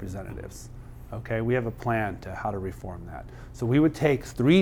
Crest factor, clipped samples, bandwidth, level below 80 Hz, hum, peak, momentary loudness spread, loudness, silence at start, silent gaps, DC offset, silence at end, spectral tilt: 18 dB; under 0.1%; 16.5 kHz; -44 dBFS; none; -8 dBFS; 19 LU; -27 LUFS; 0 s; none; under 0.1%; 0 s; -7 dB/octave